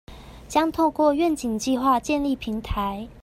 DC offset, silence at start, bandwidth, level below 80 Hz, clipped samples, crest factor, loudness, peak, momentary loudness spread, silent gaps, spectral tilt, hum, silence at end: under 0.1%; 0.1 s; 16 kHz; -42 dBFS; under 0.1%; 16 dB; -23 LUFS; -8 dBFS; 8 LU; none; -5 dB/octave; none; 0 s